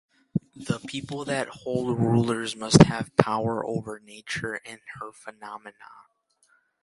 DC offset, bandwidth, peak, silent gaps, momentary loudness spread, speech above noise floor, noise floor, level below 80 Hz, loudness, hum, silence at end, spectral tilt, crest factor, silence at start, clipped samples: under 0.1%; 11.5 kHz; 0 dBFS; none; 22 LU; 41 dB; -66 dBFS; -52 dBFS; -25 LUFS; none; 0.9 s; -5.5 dB/octave; 26 dB; 0.35 s; under 0.1%